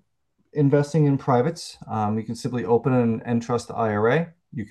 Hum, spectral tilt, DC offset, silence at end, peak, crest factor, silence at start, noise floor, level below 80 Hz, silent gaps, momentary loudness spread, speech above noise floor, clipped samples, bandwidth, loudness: none; -7.5 dB/octave; under 0.1%; 0.05 s; -6 dBFS; 16 dB; 0.55 s; -72 dBFS; -62 dBFS; none; 11 LU; 49 dB; under 0.1%; 12 kHz; -23 LUFS